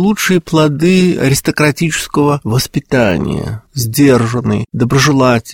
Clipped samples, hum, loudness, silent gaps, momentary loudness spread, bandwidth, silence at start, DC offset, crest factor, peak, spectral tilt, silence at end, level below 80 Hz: under 0.1%; none; -12 LUFS; none; 7 LU; 17 kHz; 0 s; 0.2%; 12 dB; 0 dBFS; -5.5 dB/octave; 0 s; -38 dBFS